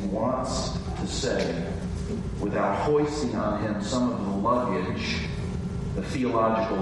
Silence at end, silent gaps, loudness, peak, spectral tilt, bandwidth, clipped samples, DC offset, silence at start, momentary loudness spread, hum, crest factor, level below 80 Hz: 0 s; none; -27 LUFS; -10 dBFS; -6 dB/octave; 11.5 kHz; under 0.1%; under 0.1%; 0 s; 8 LU; none; 16 dB; -40 dBFS